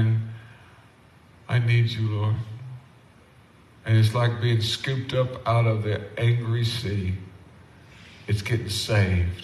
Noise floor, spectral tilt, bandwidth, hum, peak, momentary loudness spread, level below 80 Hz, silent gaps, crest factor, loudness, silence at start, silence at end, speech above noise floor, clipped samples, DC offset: -53 dBFS; -6 dB/octave; 12.5 kHz; none; -8 dBFS; 16 LU; -48 dBFS; none; 16 dB; -24 LUFS; 0 s; 0 s; 30 dB; under 0.1%; under 0.1%